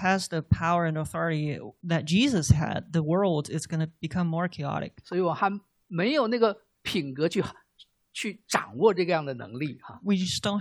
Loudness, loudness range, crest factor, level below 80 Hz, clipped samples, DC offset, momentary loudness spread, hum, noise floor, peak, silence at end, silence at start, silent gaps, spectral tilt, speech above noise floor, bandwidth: -27 LUFS; 3 LU; 20 dB; -50 dBFS; under 0.1%; under 0.1%; 11 LU; none; -60 dBFS; -8 dBFS; 0 s; 0 s; none; -5.5 dB/octave; 33 dB; 14 kHz